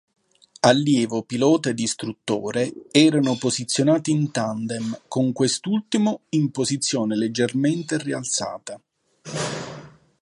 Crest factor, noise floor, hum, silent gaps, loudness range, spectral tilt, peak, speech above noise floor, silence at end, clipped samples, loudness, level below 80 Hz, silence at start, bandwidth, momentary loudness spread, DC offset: 20 dB; -42 dBFS; none; none; 4 LU; -4.5 dB/octave; -2 dBFS; 21 dB; 0.35 s; under 0.1%; -22 LUFS; -66 dBFS; 0.65 s; 11.5 kHz; 11 LU; under 0.1%